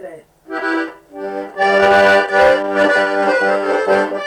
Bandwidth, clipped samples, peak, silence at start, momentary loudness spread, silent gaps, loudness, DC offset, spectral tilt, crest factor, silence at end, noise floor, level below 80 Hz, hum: 12 kHz; under 0.1%; -4 dBFS; 0 s; 15 LU; none; -14 LUFS; under 0.1%; -4.5 dB/octave; 10 dB; 0 s; -35 dBFS; -52 dBFS; none